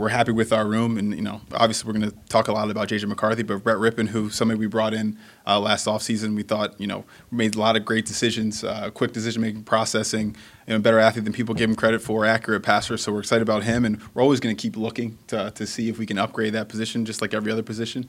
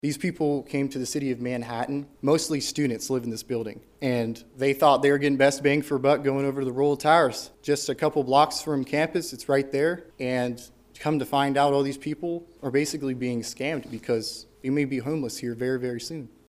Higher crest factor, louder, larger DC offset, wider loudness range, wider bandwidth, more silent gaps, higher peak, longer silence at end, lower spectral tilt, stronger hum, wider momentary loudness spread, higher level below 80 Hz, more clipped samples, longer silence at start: about the same, 20 dB vs 20 dB; first, -23 LUFS vs -26 LUFS; neither; second, 3 LU vs 6 LU; about the same, 15.5 kHz vs 15.5 kHz; neither; about the same, -2 dBFS vs -4 dBFS; second, 0 s vs 0.25 s; about the same, -4.5 dB/octave vs -5 dB/octave; neither; second, 8 LU vs 11 LU; first, -56 dBFS vs -62 dBFS; neither; about the same, 0 s vs 0.05 s